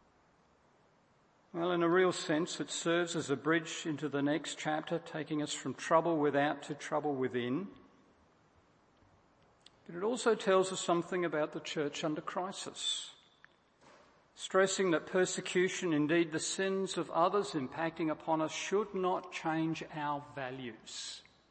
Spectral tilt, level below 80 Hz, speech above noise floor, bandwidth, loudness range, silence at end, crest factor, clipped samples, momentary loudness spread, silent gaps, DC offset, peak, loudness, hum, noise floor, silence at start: -4 dB/octave; -78 dBFS; 35 dB; 8.8 kHz; 5 LU; 0.3 s; 22 dB; under 0.1%; 10 LU; none; under 0.1%; -14 dBFS; -34 LUFS; none; -69 dBFS; 1.55 s